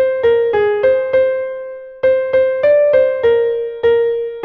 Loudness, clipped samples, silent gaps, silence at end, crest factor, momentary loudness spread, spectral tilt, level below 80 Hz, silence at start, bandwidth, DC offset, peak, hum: -14 LUFS; under 0.1%; none; 0 s; 12 dB; 6 LU; -6.5 dB/octave; -50 dBFS; 0 s; 4.6 kHz; under 0.1%; -2 dBFS; none